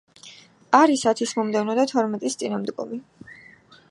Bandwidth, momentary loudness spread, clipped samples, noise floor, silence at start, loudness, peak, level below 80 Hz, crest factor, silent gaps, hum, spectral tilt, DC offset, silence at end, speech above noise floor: 11.5 kHz; 14 LU; under 0.1%; -51 dBFS; 0.25 s; -22 LUFS; 0 dBFS; -72 dBFS; 22 dB; none; none; -4 dB/octave; under 0.1%; 0.55 s; 29 dB